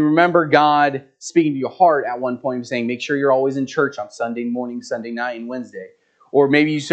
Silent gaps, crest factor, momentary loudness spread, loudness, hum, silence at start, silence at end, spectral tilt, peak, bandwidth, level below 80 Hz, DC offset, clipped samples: none; 18 dB; 13 LU; -19 LUFS; none; 0 s; 0 s; -5.5 dB/octave; 0 dBFS; 8.8 kHz; -74 dBFS; under 0.1%; under 0.1%